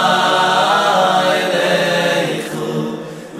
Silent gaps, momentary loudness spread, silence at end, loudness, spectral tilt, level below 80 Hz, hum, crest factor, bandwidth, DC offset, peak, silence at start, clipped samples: none; 9 LU; 0 s; -15 LUFS; -3.5 dB/octave; -68 dBFS; none; 14 dB; 15.5 kHz; under 0.1%; -2 dBFS; 0 s; under 0.1%